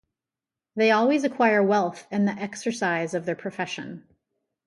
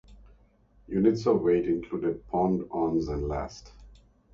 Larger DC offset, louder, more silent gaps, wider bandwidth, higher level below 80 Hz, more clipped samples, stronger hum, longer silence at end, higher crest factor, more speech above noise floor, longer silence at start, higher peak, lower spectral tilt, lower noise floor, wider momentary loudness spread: neither; first, -24 LUFS vs -28 LUFS; neither; first, 11.5 kHz vs 7.4 kHz; second, -74 dBFS vs -46 dBFS; neither; neither; first, 0.65 s vs 0.45 s; about the same, 18 dB vs 18 dB; first, 66 dB vs 34 dB; first, 0.75 s vs 0.1 s; about the same, -8 dBFS vs -10 dBFS; second, -5.5 dB/octave vs -8 dB/octave; first, -90 dBFS vs -61 dBFS; first, 13 LU vs 10 LU